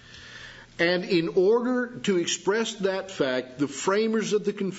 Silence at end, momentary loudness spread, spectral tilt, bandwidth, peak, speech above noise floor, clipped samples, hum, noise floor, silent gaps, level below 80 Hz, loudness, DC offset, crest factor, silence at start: 0 s; 16 LU; -4 dB/octave; 8 kHz; -8 dBFS; 20 dB; under 0.1%; none; -45 dBFS; none; -64 dBFS; -25 LUFS; under 0.1%; 18 dB; 0.1 s